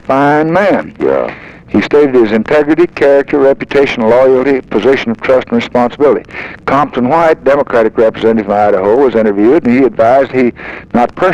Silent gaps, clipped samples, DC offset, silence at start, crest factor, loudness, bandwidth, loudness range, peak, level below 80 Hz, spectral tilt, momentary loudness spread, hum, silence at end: none; under 0.1%; under 0.1%; 0.1 s; 8 dB; -10 LUFS; 8.6 kHz; 2 LU; 0 dBFS; -42 dBFS; -7 dB/octave; 5 LU; none; 0 s